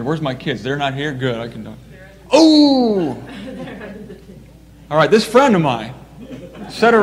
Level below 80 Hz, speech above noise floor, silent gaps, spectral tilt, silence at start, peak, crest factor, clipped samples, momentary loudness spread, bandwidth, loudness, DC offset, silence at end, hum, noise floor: -48 dBFS; 27 dB; none; -5.5 dB/octave; 0 s; 0 dBFS; 16 dB; under 0.1%; 23 LU; 13 kHz; -15 LUFS; under 0.1%; 0 s; none; -42 dBFS